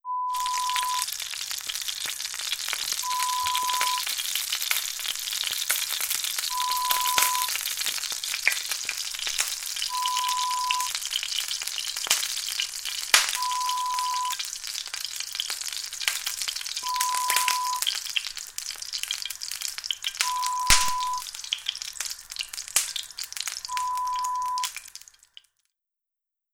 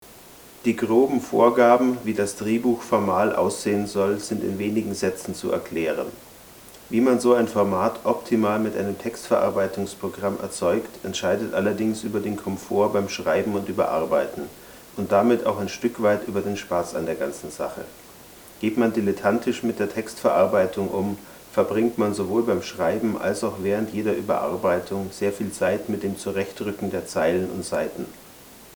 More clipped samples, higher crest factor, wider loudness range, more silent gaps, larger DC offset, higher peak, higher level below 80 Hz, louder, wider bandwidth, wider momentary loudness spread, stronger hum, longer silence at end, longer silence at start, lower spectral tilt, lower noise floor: neither; first, 28 dB vs 20 dB; about the same, 4 LU vs 5 LU; neither; neither; first, 0 dBFS vs -4 dBFS; first, -50 dBFS vs -60 dBFS; about the same, -26 LUFS vs -24 LUFS; about the same, 18.5 kHz vs over 20 kHz; about the same, 9 LU vs 11 LU; neither; first, 1.55 s vs 0 s; about the same, 0.05 s vs 0 s; second, 2.5 dB/octave vs -5.5 dB/octave; first, -87 dBFS vs -46 dBFS